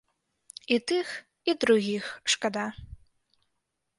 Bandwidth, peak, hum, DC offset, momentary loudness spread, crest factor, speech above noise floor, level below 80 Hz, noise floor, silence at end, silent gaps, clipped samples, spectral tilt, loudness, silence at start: 11.5 kHz; -8 dBFS; none; under 0.1%; 17 LU; 22 dB; 53 dB; -58 dBFS; -81 dBFS; 1.05 s; none; under 0.1%; -3 dB/octave; -28 LUFS; 0.7 s